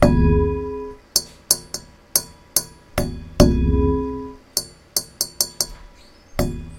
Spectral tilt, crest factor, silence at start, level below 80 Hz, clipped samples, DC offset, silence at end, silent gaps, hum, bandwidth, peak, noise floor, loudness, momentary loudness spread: -4.5 dB/octave; 22 dB; 0 s; -28 dBFS; under 0.1%; under 0.1%; 0 s; none; none; 16.5 kHz; 0 dBFS; -46 dBFS; -21 LUFS; 12 LU